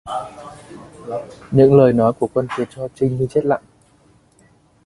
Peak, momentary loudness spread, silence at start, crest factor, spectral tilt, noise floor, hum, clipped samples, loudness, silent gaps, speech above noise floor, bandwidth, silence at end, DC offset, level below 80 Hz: 0 dBFS; 24 LU; 0.05 s; 18 dB; -8.5 dB/octave; -54 dBFS; none; under 0.1%; -17 LUFS; none; 38 dB; 11.5 kHz; 1.3 s; under 0.1%; -50 dBFS